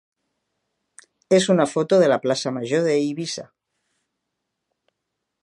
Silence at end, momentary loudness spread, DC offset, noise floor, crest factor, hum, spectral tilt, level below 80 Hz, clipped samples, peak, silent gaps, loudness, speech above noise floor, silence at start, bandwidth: 2 s; 11 LU; under 0.1%; -80 dBFS; 20 dB; none; -5 dB/octave; -72 dBFS; under 0.1%; -4 dBFS; none; -20 LUFS; 60 dB; 1.3 s; 11.5 kHz